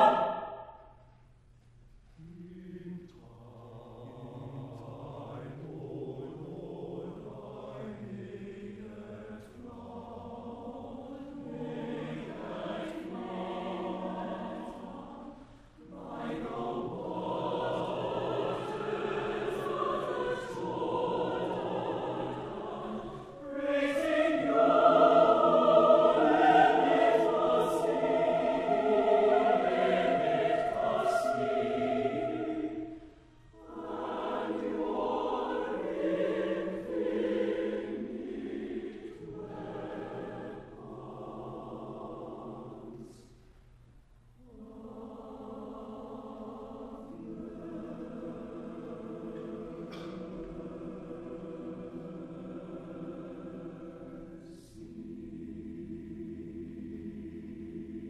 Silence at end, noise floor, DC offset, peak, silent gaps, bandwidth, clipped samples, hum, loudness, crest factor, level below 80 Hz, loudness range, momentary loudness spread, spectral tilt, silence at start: 0 s; -60 dBFS; under 0.1%; -10 dBFS; none; 12 kHz; under 0.1%; none; -31 LUFS; 24 dB; -60 dBFS; 20 LU; 21 LU; -6.5 dB/octave; 0 s